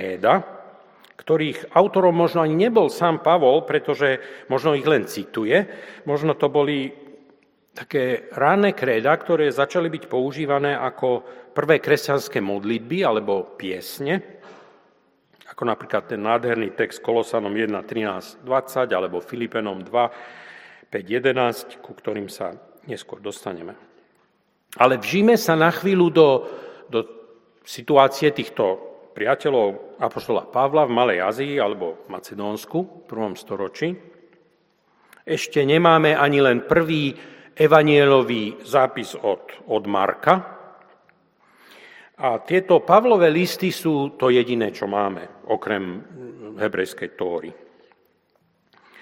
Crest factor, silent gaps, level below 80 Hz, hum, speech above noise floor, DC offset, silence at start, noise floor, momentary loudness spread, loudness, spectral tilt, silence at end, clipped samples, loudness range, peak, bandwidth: 22 dB; none; -66 dBFS; none; 45 dB; under 0.1%; 0 s; -65 dBFS; 16 LU; -20 LUFS; -6 dB/octave; 1.5 s; under 0.1%; 8 LU; 0 dBFS; 16.5 kHz